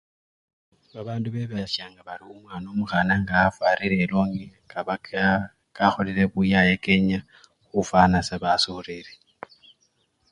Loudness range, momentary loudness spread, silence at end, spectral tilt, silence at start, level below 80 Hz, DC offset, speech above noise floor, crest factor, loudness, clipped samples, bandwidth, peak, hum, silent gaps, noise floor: 4 LU; 19 LU; 1.25 s; -6 dB/octave; 0.95 s; -48 dBFS; under 0.1%; 45 dB; 22 dB; -23 LUFS; under 0.1%; 10.5 kHz; -2 dBFS; none; none; -68 dBFS